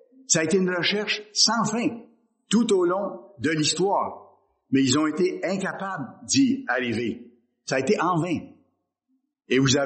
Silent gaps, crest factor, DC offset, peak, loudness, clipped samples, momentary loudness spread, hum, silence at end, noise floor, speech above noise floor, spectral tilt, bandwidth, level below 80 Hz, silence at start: none; 20 dB; under 0.1%; -4 dBFS; -24 LUFS; under 0.1%; 11 LU; none; 0 s; -73 dBFS; 50 dB; -3.5 dB/octave; 8.8 kHz; -64 dBFS; 0.3 s